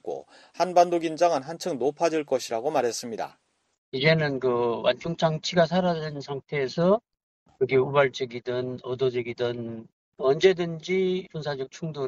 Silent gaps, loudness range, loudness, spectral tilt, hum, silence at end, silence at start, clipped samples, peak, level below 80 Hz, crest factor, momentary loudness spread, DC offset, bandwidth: 3.78-3.92 s, 7.23-7.46 s, 9.93-10.12 s; 2 LU; -26 LUFS; -5.5 dB/octave; none; 0 s; 0.05 s; under 0.1%; -6 dBFS; -64 dBFS; 20 dB; 12 LU; under 0.1%; 12.5 kHz